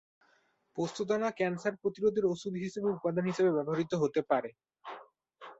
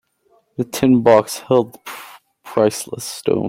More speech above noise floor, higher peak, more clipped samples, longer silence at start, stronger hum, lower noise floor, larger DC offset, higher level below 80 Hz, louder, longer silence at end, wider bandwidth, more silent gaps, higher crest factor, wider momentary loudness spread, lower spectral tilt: about the same, 40 dB vs 43 dB; second, -14 dBFS vs -2 dBFS; neither; first, 0.75 s vs 0.6 s; neither; first, -71 dBFS vs -59 dBFS; neither; second, -74 dBFS vs -56 dBFS; second, -32 LUFS vs -17 LUFS; about the same, 0.05 s vs 0 s; second, 8 kHz vs 16.5 kHz; neither; about the same, 18 dB vs 16 dB; about the same, 18 LU vs 20 LU; about the same, -6.5 dB/octave vs -5.5 dB/octave